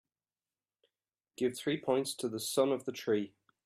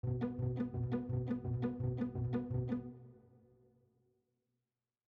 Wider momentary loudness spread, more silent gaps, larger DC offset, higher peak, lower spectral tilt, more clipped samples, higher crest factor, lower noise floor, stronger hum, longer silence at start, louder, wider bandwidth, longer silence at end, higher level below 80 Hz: about the same, 5 LU vs 3 LU; neither; neither; first, -18 dBFS vs -26 dBFS; second, -4 dB/octave vs -11.5 dB/octave; neither; about the same, 18 dB vs 14 dB; about the same, under -90 dBFS vs under -90 dBFS; neither; first, 1.4 s vs 0.05 s; first, -34 LUFS vs -39 LUFS; first, 15 kHz vs 4.4 kHz; second, 0.4 s vs 1.9 s; second, -80 dBFS vs -58 dBFS